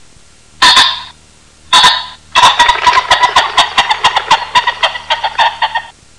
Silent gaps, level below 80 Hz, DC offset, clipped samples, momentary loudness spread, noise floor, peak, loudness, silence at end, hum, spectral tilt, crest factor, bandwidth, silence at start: none; -40 dBFS; 0.5%; 0.4%; 9 LU; -43 dBFS; 0 dBFS; -9 LUFS; 0.3 s; none; 0.5 dB/octave; 12 dB; 16.5 kHz; 0.6 s